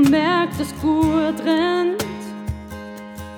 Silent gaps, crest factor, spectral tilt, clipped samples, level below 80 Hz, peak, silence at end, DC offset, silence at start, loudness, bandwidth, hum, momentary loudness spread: none; 16 dB; -5.5 dB/octave; under 0.1%; -40 dBFS; -4 dBFS; 0 s; under 0.1%; 0 s; -20 LUFS; 18 kHz; none; 17 LU